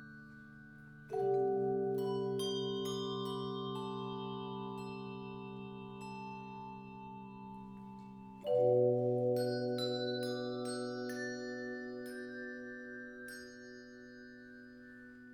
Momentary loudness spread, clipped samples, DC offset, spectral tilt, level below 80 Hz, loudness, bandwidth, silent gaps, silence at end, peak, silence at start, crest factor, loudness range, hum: 20 LU; under 0.1%; under 0.1%; -6 dB/octave; -72 dBFS; -38 LUFS; 16 kHz; none; 0 s; -20 dBFS; 0 s; 20 dB; 12 LU; none